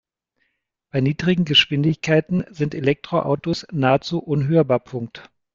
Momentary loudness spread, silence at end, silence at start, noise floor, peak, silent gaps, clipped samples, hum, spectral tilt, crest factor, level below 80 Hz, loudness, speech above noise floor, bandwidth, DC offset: 10 LU; 0.3 s; 0.95 s; -72 dBFS; -2 dBFS; none; under 0.1%; none; -6.5 dB/octave; 18 dB; -54 dBFS; -20 LUFS; 52 dB; 7.4 kHz; under 0.1%